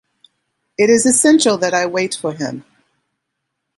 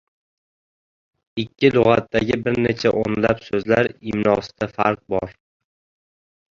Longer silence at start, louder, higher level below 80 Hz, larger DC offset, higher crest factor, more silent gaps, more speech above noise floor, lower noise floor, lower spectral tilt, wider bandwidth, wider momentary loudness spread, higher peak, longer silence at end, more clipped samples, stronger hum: second, 0.8 s vs 1.35 s; first, -14 LUFS vs -20 LUFS; second, -62 dBFS vs -50 dBFS; neither; about the same, 16 dB vs 20 dB; neither; second, 61 dB vs over 71 dB; second, -76 dBFS vs under -90 dBFS; second, -3 dB/octave vs -7 dB/octave; first, 11.5 kHz vs 7.6 kHz; first, 15 LU vs 11 LU; about the same, 0 dBFS vs -2 dBFS; about the same, 1.15 s vs 1.2 s; neither; neither